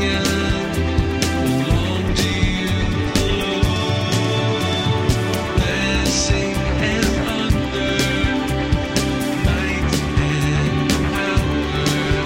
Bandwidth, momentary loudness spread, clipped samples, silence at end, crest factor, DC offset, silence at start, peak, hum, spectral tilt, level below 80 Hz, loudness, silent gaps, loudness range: 16 kHz; 2 LU; under 0.1%; 0 s; 16 dB; under 0.1%; 0 s; -2 dBFS; none; -5 dB/octave; -26 dBFS; -19 LUFS; none; 1 LU